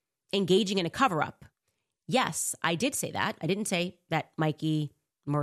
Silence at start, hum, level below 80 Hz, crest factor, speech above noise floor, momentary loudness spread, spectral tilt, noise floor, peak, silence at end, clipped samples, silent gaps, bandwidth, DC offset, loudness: 0.35 s; none; -68 dBFS; 20 dB; 52 dB; 8 LU; -4 dB/octave; -81 dBFS; -10 dBFS; 0 s; under 0.1%; none; 13.5 kHz; under 0.1%; -29 LUFS